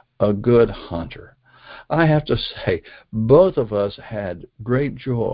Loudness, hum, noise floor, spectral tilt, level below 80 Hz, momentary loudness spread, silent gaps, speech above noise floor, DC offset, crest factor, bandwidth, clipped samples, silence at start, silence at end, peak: -20 LUFS; none; -44 dBFS; -12 dB/octave; -42 dBFS; 16 LU; none; 24 dB; under 0.1%; 18 dB; 5.2 kHz; under 0.1%; 0.2 s; 0 s; -2 dBFS